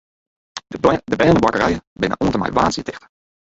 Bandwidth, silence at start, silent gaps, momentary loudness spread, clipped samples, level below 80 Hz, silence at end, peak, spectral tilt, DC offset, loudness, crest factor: 8 kHz; 0.55 s; 1.87-1.96 s; 18 LU; under 0.1%; -40 dBFS; 0.6 s; 0 dBFS; -6 dB/octave; under 0.1%; -18 LUFS; 18 dB